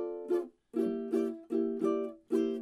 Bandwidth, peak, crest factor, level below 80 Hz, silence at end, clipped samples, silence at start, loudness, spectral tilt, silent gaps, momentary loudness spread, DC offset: 12 kHz; -20 dBFS; 14 dB; -78 dBFS; 0 s; under 0.1%; 0 s; -34 LUFS; -7 dB/octave; none; 3 LU; under 0.1%